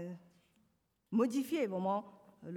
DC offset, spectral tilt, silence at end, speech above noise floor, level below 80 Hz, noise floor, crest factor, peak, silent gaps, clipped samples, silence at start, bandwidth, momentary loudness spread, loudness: under 0.1%; -6.5 dB/octave; 0 s; 43 dB; -86 dBFS; -77 dBFS; 16 dB; -22 dBFS; none; under 0.1%; 0 s; 19 kHz; 18 LU; -36 LUFS